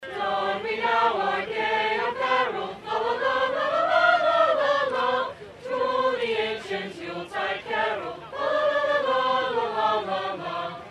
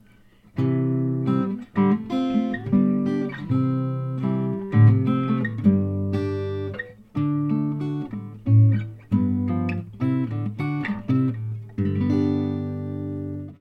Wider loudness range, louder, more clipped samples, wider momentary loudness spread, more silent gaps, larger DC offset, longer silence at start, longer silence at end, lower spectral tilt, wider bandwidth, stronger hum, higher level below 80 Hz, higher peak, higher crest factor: about the same, 4 LU vs 3 LU; about the same, -25 LUFS vs -24 LUFS; neither; about the same, 11 LU vs 11 LU; neither; neither; second, 0 s vs 0.55 s; about the same, 0 s vs 0.05 s; second, -4 dB/octave vs -10 dB/octave; first, 11.5 kHz vs 5.4 kHz; neither; second, -64 dBFS vs -56 dBFS; about the same, -6 dBFS vs -4 dBFS; about the same, 18 dB vs 18 dB